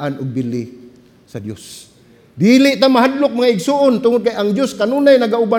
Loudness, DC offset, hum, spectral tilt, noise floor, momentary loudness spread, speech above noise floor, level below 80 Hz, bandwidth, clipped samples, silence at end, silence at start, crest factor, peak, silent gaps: -14 LUFS; under 0.1%; none; -5.5 dB/octave; -43 dBFS; 19 LU; 29 dB; -60 dBFS; 16.5 kHz; under 0.1%; 0 s; 0 s; 14 dB; 0 dBFS; none